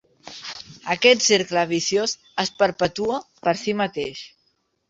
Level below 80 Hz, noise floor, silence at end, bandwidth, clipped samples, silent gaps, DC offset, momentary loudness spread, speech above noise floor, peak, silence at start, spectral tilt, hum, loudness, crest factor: -60 dBFS; -69 dBFS; 0.6 s; 8 kHz; under 0.1%; none; under 0.1%; 18 LU; 47 dB; -2 dBFS; 0.25 s; -2.5 dB/octave; none; -21 LUFS; 22 dB